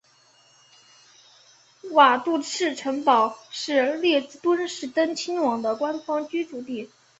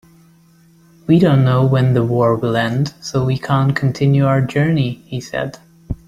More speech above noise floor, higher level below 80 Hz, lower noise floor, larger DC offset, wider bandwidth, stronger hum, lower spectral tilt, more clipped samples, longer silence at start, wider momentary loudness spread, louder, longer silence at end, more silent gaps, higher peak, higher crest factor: about the same, 35 dB vs 35 dB; second, -74 dBFS vs -44 dBFS; first, -59 dBFS vs -50 dBFS; neither; second, 8.2 kHz vs 9.8 kHz; neither; second, -2.5 dB/octave vs -7.5 dB/octave; neither; first, 1.85 s vs 1.1 s; about the same, 14 LU vs 12 LU; second, -23 LUFS vs -16 LUFS; first, 0.35 s vs 0.1 s; neither; about the same, -4 dBFS vs -2 dBFS; first, 22 dB vs 14 dB